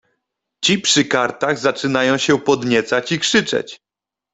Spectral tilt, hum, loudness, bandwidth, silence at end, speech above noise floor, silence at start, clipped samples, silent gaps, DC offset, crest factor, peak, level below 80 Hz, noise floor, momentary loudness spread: -3 dB/octave; none; -17 LUFS; 8.4 kHz; 0.6 s; 70 dB; 0.6 s; under 0.1%; none; under 0.1%; 16 dB; -2 dBFS; -58 dBFS; -87 dBFS; 5 LU